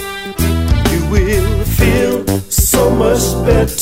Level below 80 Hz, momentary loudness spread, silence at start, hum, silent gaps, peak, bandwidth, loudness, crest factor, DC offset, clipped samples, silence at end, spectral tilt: -18 dBFS; 5 LU; 0 s; none; none; 0 dBFS; 16.5 kHz; -13 LUFS; 12 dB; under 0.1%; under 0.1%; 0 s; -5 dB/octave